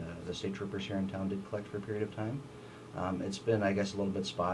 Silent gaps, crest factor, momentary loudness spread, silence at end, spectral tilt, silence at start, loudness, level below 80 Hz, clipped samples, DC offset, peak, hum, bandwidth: none; 18 dB; 9 LU; 0 s; -6 dB/octave; 0 s; -36 LUFS; -64 dBFS; under 0.1%; under 0.1%; -18 dBFS; none; 11.5 kHz